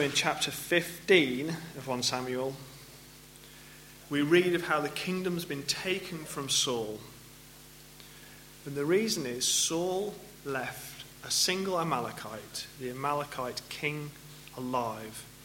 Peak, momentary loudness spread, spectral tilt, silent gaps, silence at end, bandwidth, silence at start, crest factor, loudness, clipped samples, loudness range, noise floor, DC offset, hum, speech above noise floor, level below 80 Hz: -8 dBFS; 23 LU; -3 dB/octave; none; 0 s; 17 kHz; 0 s; 24 dB; -31 LUFS; under 0.1%; 5 LU; -52 dBFS; under 0.1%; none; 21 dB; -64 dBFS